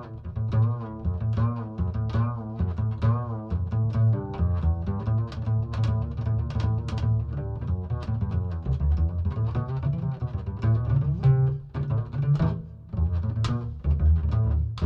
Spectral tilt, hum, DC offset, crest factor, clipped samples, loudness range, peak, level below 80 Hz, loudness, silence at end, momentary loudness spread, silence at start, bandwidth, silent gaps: -9.5 dB/octave; none; under 0.1%; 14 dB; under 0.1%; 2 LU; -10 dBFS; -32 dBFS; -27 LUFS; 0 s; 7 LU; 0 s; 5.8 kHz; none